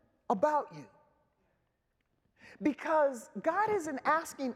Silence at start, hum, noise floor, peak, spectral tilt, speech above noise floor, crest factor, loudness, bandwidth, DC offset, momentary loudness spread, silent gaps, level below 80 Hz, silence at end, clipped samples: 0.3 s; none; -79 dBFS; -16 dBFS; -5 dB/octave; 47 dB; 18 dB; -32 LUFS; 15.5 kHz; under 0.1%; 6 LU; none; -78 dBFS; 0 s; under 0.1%